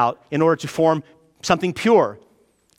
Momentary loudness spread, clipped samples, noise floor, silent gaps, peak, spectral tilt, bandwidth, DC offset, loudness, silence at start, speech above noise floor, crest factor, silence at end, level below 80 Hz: 9 LU; under 0.1%; -60 dBFS; none; -2 dBFS; -5.5 dB/octave; 15.5 kHz; under 0.1%; -19 LUFS; 0 s; 41 dB; 18 dB; 0.6 s; -58 dBFS